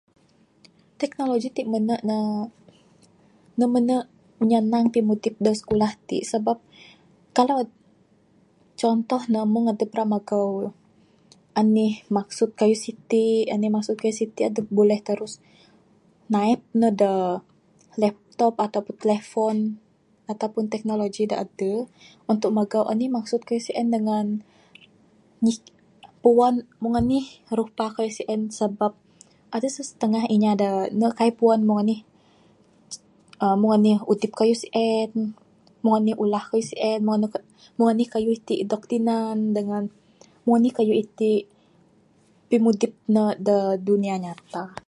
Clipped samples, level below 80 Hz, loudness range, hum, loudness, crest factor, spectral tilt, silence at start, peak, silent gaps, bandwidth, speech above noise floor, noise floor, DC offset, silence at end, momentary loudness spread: under 0.1%; -60 dBFS; 4 LU; none; -23 LUFS; 20 dB; -6.5 dB/octave; 1 s; -4 dBFS; none; 11 kHz; 37 dB; -59 dBFS; under 0.1%; 0.15 s; 10 LU